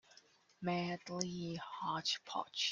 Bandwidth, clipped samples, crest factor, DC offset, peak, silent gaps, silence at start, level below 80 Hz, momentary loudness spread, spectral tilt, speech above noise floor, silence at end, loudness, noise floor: 9.8 kHz; under 0.1%; 24 dB; under 0.1%; -16 dBFS; none; 0.6 s; -76 dBFS; 7 LU; -3.5 dB/octave; 27 dB; 0 s; -40 LUFS; -67 dBFS